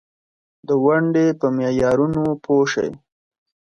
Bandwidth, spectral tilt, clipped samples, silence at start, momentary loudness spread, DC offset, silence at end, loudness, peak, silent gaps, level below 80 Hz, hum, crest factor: 9.2 kHz; -6.5 dB/octave; under 0.1%; 0.7 s; 7 LU; under 0.1%; 0.8 s; -19 LUFS; -4 dBFS; none; -52 dBFS; none; 16 dB